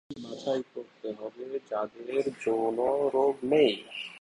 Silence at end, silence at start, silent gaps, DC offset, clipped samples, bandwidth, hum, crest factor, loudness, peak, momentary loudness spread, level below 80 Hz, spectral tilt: 0 s; 0.1 s; none; under 0.1%; under 0.1%; 11 kHz; none; 18 dB; -29 LUFS; -12 dBFS; 15 LU; -70 dBFS; -5.5 dB/octave